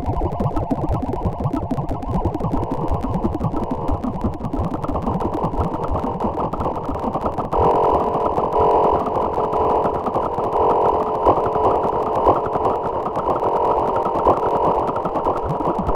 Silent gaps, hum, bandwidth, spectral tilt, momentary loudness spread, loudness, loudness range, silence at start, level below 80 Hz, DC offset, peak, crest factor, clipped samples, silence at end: none; none; 15.5 kHz; -9 dB/octave; 7 LU; -20 LUFS; 5 LU; 0 s; -32 dBFS; under 0.1%; -2 dBFS; 16 dB; under 0.1%; 0 s